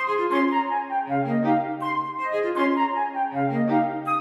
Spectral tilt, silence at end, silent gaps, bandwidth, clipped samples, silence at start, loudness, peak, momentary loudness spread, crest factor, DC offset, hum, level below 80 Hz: -7.5 dB/octave; 0 s; none; 12 kHz; under 0.1%; 0 s; -24 LUFS; -10 dBFS; 5 LU; 14 dB; under 0.1%; none; -82 dBFS